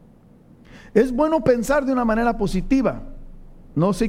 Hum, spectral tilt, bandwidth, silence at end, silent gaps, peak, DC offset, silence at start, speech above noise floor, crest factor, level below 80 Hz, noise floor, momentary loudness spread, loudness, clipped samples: none; -7 dB/octave; 16 kHz; 0 s; none; -2 dBFS; under 0.1%; 0.75 s; 30 dB; 20 dB; -36 dBFS; -49 dBFS; 6 LU; -20 LUFS; under 0.1%